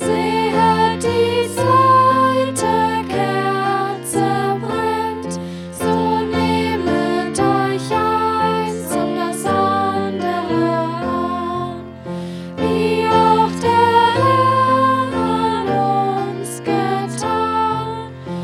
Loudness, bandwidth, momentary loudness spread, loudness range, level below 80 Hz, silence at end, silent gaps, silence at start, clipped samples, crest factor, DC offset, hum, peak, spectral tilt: -17 LUFS; 16.5 kHz; 10 LU; 5 LU; -48 dBFS; 0 s; none; 0 s; under 0.1%; 16 dB; under 0.1%; none; -2 dBFS; -5.5 dB/octave